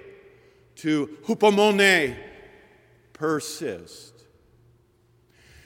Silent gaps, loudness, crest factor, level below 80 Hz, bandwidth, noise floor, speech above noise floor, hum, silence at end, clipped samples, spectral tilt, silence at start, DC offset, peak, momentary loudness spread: none; -22 LUFS; 22 dB; -62 dBFS; 17 kHz; -61 dBFS; 39 dB; none; 1.65 s; under 0.1%; -4 dB/octave; 0.05 s; under 0.1%; -4 dBFS; 24 LU